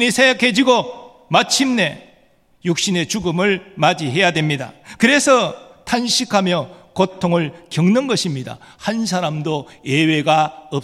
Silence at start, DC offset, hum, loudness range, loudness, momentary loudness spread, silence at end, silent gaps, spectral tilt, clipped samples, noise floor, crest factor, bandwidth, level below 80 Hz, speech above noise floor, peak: 0 s; under 0.1%; none; 3 LU; -17 LUFS; 11 LU; 0 s; none; -4 dB/octave; under 0.1%; -54 dBFS; 18 dB; 15 kHz; -56 dBFS; 37 dB; 0 dBFS